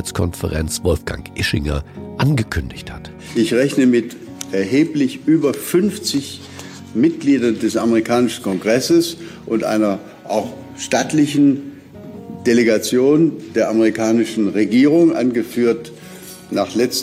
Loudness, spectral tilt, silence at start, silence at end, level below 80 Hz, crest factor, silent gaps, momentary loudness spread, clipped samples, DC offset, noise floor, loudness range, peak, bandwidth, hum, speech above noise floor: -17 LUFS; -5.5 dB/octave; 0 s; 0 s; -38 dBFS; 14 dB; none; 17 LU; under 0.1%; under 0.1%; -36 dBFS; 4 LU; -4 dBFS; 16 kHz; none; 20 dB